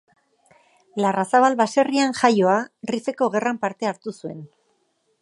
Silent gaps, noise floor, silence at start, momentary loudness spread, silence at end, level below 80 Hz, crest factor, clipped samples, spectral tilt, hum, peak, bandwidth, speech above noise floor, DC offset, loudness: none; -68 dBFS; 0.95 s; 16 LU; 0.75 s; -72 dBFS; 20 dB; under 0.1%; -5 dB/octave; none; -2 dBFS; 11.5 kHz; 47 dB; under 0.1%; -21 LUFS